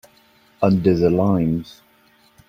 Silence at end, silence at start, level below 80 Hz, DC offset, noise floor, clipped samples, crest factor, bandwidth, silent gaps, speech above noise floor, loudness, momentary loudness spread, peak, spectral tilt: 0.8 s; 0.6 s; -48 dBFS; under 0.1%; -56 dBFS; under 0.1%; 18 dB; 15.5 kHz; none; 38 dB; -19 LUFS; 6 LU; -2 dBFS; -9.5 dB/octave